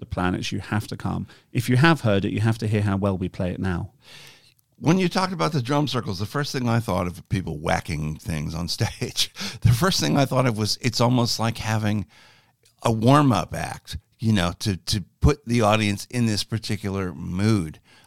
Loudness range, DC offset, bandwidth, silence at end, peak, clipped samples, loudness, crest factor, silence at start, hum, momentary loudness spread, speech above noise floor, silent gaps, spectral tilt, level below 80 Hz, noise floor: 3 LU; 0.5%; 16 kHz; 0 s; -2 dBFS; under 0.1%; -23 LUFS; 20 dB; 0 s; none; 10 LU; 36 dB; none; -5.5 dB/octave; -42 dBFS; -59 dBFS